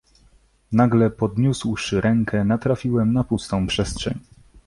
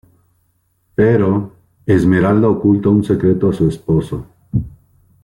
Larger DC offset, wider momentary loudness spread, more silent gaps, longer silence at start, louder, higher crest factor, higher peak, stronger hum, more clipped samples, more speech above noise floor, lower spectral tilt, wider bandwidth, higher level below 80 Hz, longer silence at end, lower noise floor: neither; second, 7 LU vs 14 LU; neither; second, 0.7 s vs 1 s; second, -21 LUFS vs -15 LUFS; about the same, 16 dB vs 14 dB; second, -6 dBFS vs -2 dBFS; neither; neither; second, 36 dB vs 49 dB; second, -6.5 dB/octave vs -9.5 dB/octave; about the same, 11.5 kHz vs 11.5 kHz; about the same, -42 dBFS vs -40 dBFS; about the same, 0.45 s vs 0.55 s; second, -56 dBFS vs -62 dBFS